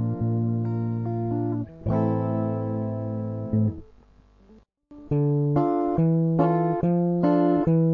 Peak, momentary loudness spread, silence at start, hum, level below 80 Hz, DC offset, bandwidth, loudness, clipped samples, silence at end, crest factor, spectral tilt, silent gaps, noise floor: -8 dBFS; 8 LU; 0 s; none; -50 dBFS; under 0.1%; 4.4 kHz; -24 LUFS; under 0.1%; 0 s; 16 dB; -12.5 dB/octave; none; -55 dBFS